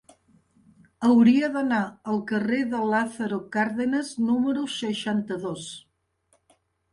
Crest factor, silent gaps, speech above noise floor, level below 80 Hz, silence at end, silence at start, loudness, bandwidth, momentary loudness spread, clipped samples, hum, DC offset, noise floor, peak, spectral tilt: 16 dB; none; 44 dB; -66 dBFS; 1.15 s; 1 s; -24 LUFS; 11 kHz; 13 LU; under 0.1%; none; under 0.1%; -68 dBFS; -8 dBFS; -5.5 dB/octave